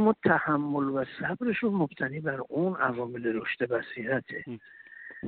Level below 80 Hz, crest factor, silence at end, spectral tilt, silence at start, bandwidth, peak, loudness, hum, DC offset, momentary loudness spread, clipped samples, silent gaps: -68 dBFS; 20 dB; 0 s; -5.5 dB/octave; 0 s; 4.5 kHz; -8 dBFS; -29 LUFS; none; under 0.1%; 14 LU; under 0.1%; none